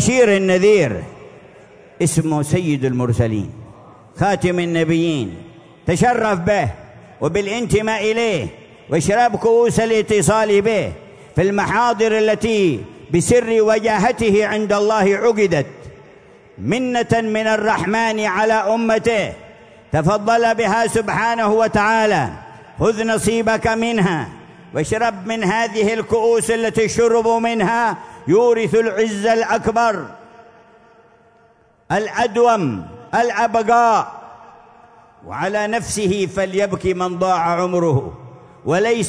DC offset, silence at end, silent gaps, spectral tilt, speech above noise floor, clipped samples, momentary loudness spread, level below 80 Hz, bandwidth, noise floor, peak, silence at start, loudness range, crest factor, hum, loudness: under 0.1%; 0 s; none; -5 dB/octave; 37 dB; under 0.1%; 10 LU; -46 dBFS; 11 kHz; -53 dBFS; -2 dBFS; 0 s; 4 LU; 16 dB; none; -17 LUFS